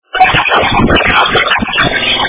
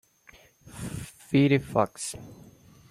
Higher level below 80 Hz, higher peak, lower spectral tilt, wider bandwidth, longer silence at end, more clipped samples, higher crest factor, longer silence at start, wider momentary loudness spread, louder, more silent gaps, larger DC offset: first, -26 dBFS vs -56 dBFS; first, 0 dBFS vs -8 dBFS; first, -8 dB/octave vs -6 dB/octave; second, 4 kHz vs 15 kHz; second, 0 s vs 0.55 s; first, 0.9% vs under 0.1%; second, 10 dB vs 22 dB; second, 0.15 s vs 0.65 s; second, 2 LU vs 22 LU; first, -9 LUFS vs -27 LUFS; neither; neither